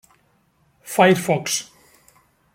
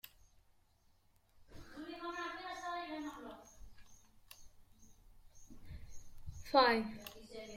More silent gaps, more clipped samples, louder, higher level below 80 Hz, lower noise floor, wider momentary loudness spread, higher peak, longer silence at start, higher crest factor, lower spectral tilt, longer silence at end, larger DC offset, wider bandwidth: neither; neither; first, -19 LUFS vs -37 LUFS; about the same, -64 dBFS vs -62 dBFS; second, -62 dBFS vs -71 dBFS; second, 10 LU vs 29 LU; first, -2 dBFS vs -14 dBFS; first, 0.85 s vs 0.05 s; second, 22 dB vs 28 dB; about the same, -4 dB/octave vs -4 dB/octave; first, 0.9 s vs 0 s; neither; about the same, 16.5 kHz vs 16.5 kHz